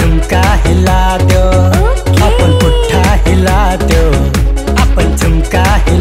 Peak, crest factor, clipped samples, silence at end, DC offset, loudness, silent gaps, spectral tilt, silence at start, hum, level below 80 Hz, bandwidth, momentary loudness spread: 0 dBFS; 8 dB; under 0.1%; 0 s; under 0.1%; -10 LUFS; none; -6 dB/octave; 0 s; none; -12 dBFS; 16 kHz; 2 LU